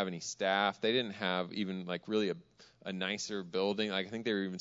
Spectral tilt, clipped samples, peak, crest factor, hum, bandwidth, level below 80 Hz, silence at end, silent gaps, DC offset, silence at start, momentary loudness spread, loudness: -3 dB/octave; under 0.1%; -14 dBFS; 20 dB; none; 7.6 kHz; -78 dBFS; 0 s; none; under 0.1%; 0 s; 7 LU; -35 LUFS